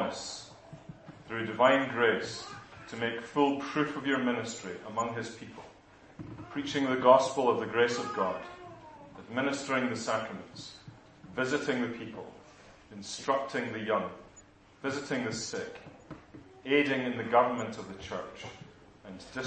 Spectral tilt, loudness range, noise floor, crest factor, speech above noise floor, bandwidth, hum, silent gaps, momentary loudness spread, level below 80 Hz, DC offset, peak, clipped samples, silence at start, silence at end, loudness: -4.5 dB/octave; 7 LU; -57 dBFS; 24 dB; 27 dB; 8.4 kHz; none; none; 23 LU; -68 dBFS; under 0.1%; -8 dBFS; under 0.1%; 0 s; 0 s; -31 LUFS